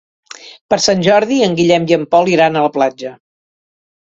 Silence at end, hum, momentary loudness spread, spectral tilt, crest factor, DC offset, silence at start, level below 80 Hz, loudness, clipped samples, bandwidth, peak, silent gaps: 0.9 s; none; 18 LU; -4.5 dB/octave; 14 dB; under 0.1%; 0.45 s; -54 dBFS; -13 LUFS; under 0.1%; 8 kHz; 0 dBFS; 0.61-0.69 s